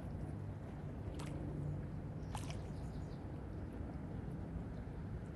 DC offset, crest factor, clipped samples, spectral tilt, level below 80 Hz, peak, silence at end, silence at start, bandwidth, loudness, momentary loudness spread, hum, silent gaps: under 0.1%; 14 dB; under 0.1%; -7.5 dB/octave; -52 dBFS; -30 dBFS; 0 s; 0 s; 12.5 kHz; -47 LUFS; 4 LU; none; none